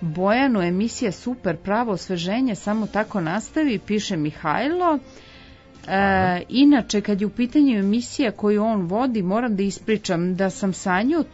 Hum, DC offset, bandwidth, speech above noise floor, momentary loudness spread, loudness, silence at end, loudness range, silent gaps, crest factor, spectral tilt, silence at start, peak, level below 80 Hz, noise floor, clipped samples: none; under 0.1%; 8 kHz; 25 dB; 7 LU; -22 LUFS; 0.05 s; 4 LU; none; 16 dB; -5.5 dB/octave; 0 s; -6 dBFS; -50 dBFS; -46 dBFS; under 0.1%